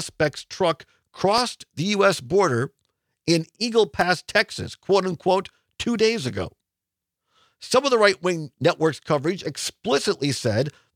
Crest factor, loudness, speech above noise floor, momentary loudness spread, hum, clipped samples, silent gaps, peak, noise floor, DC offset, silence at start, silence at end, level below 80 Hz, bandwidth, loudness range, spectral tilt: 20 dB; -23 LUFS; 63 dB; 10 LU; none; under 0.1%; none; -2 dBFS; -86 dBFS; under 0.1%; 0 s; 0.25 s; -60 dBFS; 16 kHz; 2 LU; -4.5 dB/octave